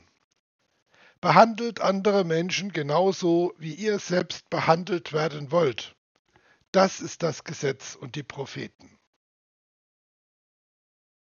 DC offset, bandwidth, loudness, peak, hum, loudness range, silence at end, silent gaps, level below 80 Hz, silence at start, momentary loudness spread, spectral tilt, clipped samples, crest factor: under 0.1%; 7.2 kHz; -25 LUFS; -2 dBFS; none; 14 LU; 2.7 s; 5.98-6.25 s, 6.68-6.73 s; -74 dBFS; 1.25 s; 15 LU; -4.5 dB/octave; under 0.1%; 26 dB